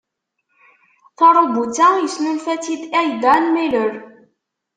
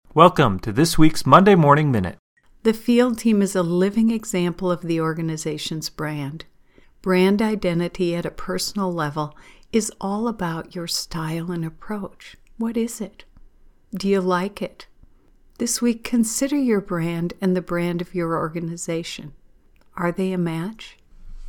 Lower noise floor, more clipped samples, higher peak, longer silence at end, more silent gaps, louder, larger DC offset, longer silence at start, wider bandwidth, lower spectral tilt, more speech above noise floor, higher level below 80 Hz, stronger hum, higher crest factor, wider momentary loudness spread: first, -72 dBFS vs -53 dBFS; neither; about the same, -2 dBFS vs 0 dBFS; first, 0.7 s vs 0 s; second, none vs 2.19-2.36 s; first, -16 LUFS vs -21 LUFS; neither; first, 1.2 s vs 0.15 s; second, 9.4 kHz vs 19 kHz; second, -3.5 dB/octave vs -5.5 dB/octave; first, 57 dB vs 32 dB; second, -64 dBFS vs -42 dBFS; neither; second, 16 dB vs 22 dB; second, 10 LU vs 15 LU